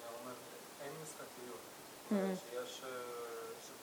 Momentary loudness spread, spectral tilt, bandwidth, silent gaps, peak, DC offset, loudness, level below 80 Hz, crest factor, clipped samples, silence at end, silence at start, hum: 13 LU; -4.5 dB/octave; over 20 kHz; none; -26 dBFS; under 0.1%; -45 LUFS; -86 dBFS; 20 dB; under 0.1%; 0 s; 0 s; none